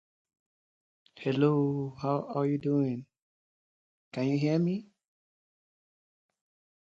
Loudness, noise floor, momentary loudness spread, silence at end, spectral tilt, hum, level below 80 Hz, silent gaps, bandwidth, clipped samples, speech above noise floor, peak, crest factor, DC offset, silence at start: -30 LUFS; under -90 dBFS; 11 LU; 2 s; -8.5 dB/octave; none; -74 dBFS; 3.22-4.11 s; 7.6 kHz; under 0.1%; over 61 dB; -12 dBFS; 20 dB; under 0.1%; 1.15 s